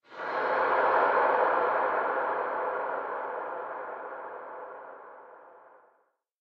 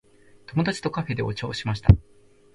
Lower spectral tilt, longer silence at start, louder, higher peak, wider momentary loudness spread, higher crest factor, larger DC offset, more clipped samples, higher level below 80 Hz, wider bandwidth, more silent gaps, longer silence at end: second, -5.5 dB/octave vs -7 dB/octave; second, 0.1 s vs 0.5 s; second, -28 LUFS vs -24 LUFS; second, -12 dBFS vs 0 dBFS; first, 19 LU vs 9 LU; second, 18 dB vs 24 dB; neither; neither; second, -74 dBFS vs -34 dBFS; second, 6 kHz vs 11.5 kHz; neither; first, 0.8 s vs 0.55 s